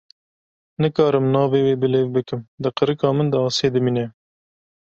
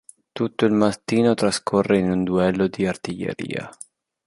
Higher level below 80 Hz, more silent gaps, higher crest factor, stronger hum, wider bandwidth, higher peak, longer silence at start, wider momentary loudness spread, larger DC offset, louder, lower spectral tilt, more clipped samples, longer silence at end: second, -58 dBFS vs -52 dBFS; first, 2.48-2.58 s vs none; about the same, 18 dB vs 18 dB; neither; second, 8 kHz vs 11.5 kHz; about the same, -2 dBFS vs -4 dBFS; first, 0.8 s vs 0.35 s; about the same, 9 LU vs 11 LU; neither; about the same, -20 LUFS vs -21 LUFS; about the same, -6.5 dB/octave vs -6 dB/octave; neither; first, 0.8 s vs 0.55 s